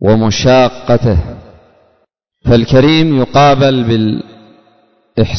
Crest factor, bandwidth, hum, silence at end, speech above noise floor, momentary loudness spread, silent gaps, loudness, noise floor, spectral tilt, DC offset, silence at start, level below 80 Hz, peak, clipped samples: 12 dB; 6.4 kHz; none; 0 s; 51 dB; 11 LU; none; -10 LUFS; -60 dBFS; -6.5 dB/octave; under 0.1%; 0 s; -28 dBFS; 0 dBFS; under 0.1%